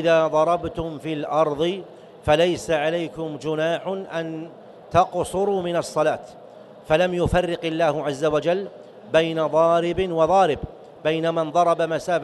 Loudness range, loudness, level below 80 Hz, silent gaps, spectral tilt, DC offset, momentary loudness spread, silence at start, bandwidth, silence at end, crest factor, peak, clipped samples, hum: 4 LU; -22 LUFS; -46 dBFS; none; -5.5 dB/octave; under 0.1%; 11 LU; 0 s; 12 kHz; 0 s; 18 dB; -4 dBFS; under 0.1%; none